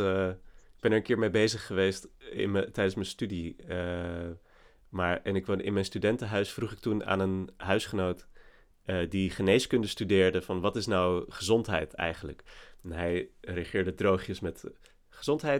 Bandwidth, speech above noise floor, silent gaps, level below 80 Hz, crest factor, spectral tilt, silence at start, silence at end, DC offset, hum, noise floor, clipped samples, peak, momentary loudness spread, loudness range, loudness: 16 kHz; 26 dB; none; -54 dBFS; 20 dB; -5.5 dB/octave; 0 s; 0 s; under 0.1%; none; -56 dBFS; under 0.1%; -10 dBFS; 15 LU; 5 LU; -30 LUFS